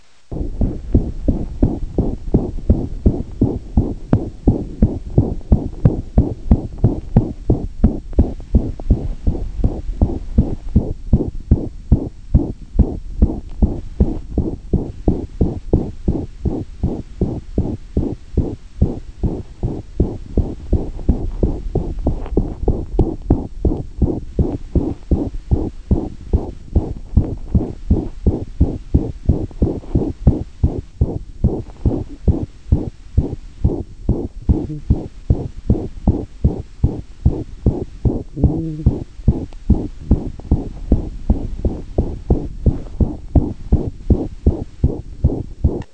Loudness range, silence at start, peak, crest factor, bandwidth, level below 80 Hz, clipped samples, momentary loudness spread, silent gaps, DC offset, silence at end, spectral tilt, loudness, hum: 4 LU; 0.3 s; 0 dBFS; 18 dB; 6.2 kHz; -22 dBFS; under 0.1%; 5 LU; none; 0.9%; 0.1 s; -11 dB/octave; -21 LUFS; none